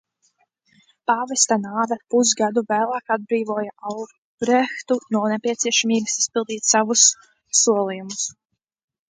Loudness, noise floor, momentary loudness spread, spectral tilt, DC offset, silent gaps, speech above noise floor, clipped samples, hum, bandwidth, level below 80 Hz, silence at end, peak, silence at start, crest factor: -20 LUFS; -66 dBFS; 12 LU; -2 dB/octave; under 0.1%; 4.18-4.38 s; 45 dB; under 0.1%; none; 10 kHz; -70 dBFS; 0.8 s; -2 dBFS; 1.1 s; 20 dB